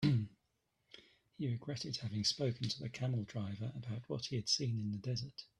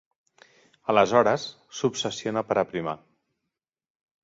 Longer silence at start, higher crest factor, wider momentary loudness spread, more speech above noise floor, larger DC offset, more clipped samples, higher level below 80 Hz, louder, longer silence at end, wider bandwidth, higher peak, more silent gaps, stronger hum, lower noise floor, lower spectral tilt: second, 0 s vs 0.9 s; second, 18 dB vs 24 dB; second, 10 LU vs 15 LU; second, 43 dB vs 60 dB; neither; neither; about the same, -70 dBFS vs -66 dBFS; second, -39 LUFS vs -25 LUFS; second, 0.15 s vs 1.25 s; first, 11.5 kHz vs 7.8 kHz; second, -20 dBFS vs -4 dBFS; neither; neither; about the same, -82 dBFS vs -85 dBFS; about the same, -5 dB/octave vs -4.5 dB/octave